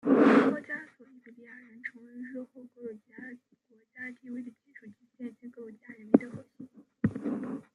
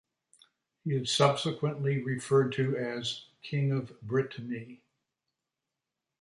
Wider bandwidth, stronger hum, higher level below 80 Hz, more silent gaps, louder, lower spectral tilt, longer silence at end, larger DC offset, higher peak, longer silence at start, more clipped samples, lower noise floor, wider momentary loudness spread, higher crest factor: second, 8.4 kHz vs 11.5 kHz; neither; about the same, -74 dBFS vs -72 dBFS; neither; about the same, -29 LUFS vs -31 LUFS; first, -8 dB/octave vs -5.5 dB/octave; second, 0.15 s vs 1.45 s; neither; first, -6 dBFS vs -10 dBFS; second, 0.05 s vs 0.85 s; neither; second, -67 dBFS vs -88 dBFS; first, 26 LU vs 14 LU; about the same, 26 dB vs 22 dB